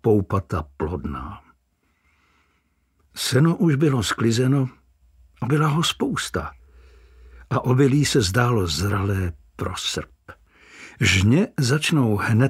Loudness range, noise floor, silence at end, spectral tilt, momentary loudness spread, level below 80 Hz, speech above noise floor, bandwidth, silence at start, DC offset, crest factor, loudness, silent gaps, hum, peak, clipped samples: 4 LU; -67 dBFS; 0 s; -5.5 dB/octave; 14 LU; -44 dBFS; 47 dB; 16 kHz; 0.05 s; under 0.1%; 18 dB; -21 LUFS; none; none; -4 dBFS; under 0.1%